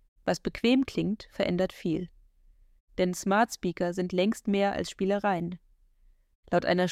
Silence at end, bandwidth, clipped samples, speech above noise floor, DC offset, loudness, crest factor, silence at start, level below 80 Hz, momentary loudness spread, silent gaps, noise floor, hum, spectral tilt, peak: 0 s; 15.5 kHz; under 0.1%; 34 dB; under 0.1%; -29 LUFS; 16 dB; 0.25 s; -56 dBFS; 7 LU; 2.80-2.88 s, 6.35-6.43 s; -62 dBFS; none; -5.5 dB/octave; -12 dBFS